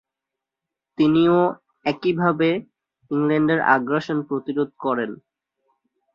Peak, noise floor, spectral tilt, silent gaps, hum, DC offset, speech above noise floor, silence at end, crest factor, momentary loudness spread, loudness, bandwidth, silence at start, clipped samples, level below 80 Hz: -4 dBFS; -86 dBFS; -8 dB/octave; none; none; under 0.1%; 66 dB; 1 s; 18 dB; 10 LU; -21 LUFS; 6.8 kHz; 1 s; under 0.1%; -62 dBFS